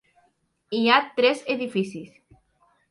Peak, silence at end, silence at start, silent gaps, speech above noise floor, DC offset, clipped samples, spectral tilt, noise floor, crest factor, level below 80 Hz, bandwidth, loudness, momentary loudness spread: -4 dBFS; 0.85 s; 0.7 s; none; 45 dB; under 0.1%; under 0.1%; -5 dB/octave; -68 dBFS; 22 dB; -72 dBFS; 11.5 kHz; -23 LUFS; 13 LU